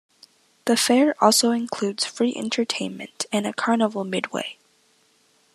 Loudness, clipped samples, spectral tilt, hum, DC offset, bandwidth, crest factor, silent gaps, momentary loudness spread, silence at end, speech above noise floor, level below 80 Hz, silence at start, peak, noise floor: -22 LUFS; under 0.1%; -3 dB/octave; none; under 0.1%; 13.5 kHz; 22 dB; none; 13 LU; 1 s; 40 dB; -78 dBFS; 0.65 s; -2 dBFS; -62 dBFS